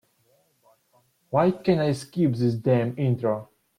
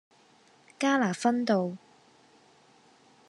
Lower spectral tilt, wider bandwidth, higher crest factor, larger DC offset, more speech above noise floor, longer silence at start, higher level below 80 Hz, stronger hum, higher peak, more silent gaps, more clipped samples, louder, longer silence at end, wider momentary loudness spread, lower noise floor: first, -8 dB/octave vs -5 dB/octave; first, 13.5 kHz vs 11.5 kHz; about the same, 16 dB vs 20 dB; neither; first, 42 dB vs 34 dB; first, 1.3 s vs 0.8 s; first, -62 dBFS vs -86 dBFS; neither; first, -8 dBFS vs -12 dBFS; neither; neither; first, -24 LUFS vs -28 LUFS; second, 0.35 s vs 1.5 s; second, 5 LU vs 9 LU; first, -65 dBFS vs -61 dBFS